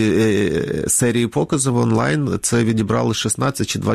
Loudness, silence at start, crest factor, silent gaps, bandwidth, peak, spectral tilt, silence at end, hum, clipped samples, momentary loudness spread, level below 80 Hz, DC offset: -18 LUFS; 0 s; 12 dB; none; 15 kHz; -6 dBFS; -5 dB/octave; 0 s; none; under 0.1%; 4 LU; -44 dBFS; under 0.1%